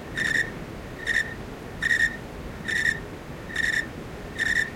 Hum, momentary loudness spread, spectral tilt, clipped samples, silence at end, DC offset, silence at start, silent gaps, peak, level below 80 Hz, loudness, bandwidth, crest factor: none; 15 LU; -3 dB/octave; under 0.1%; 0 s; under 0.1%; 0 s; none; -10 dBFS; -46 dBFS; -25 LUFS; 16.5 kHz; 20 dB